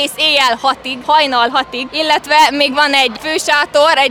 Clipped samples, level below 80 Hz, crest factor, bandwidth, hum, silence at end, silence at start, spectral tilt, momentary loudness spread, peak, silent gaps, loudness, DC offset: under 0.1%; -52 dBFS; 12 dB; over 20 kHz; none; 0 s; 0 s; -1 dB/octave; 7 LU; 0 dBFS; none; -12 LUFS; under 0.1%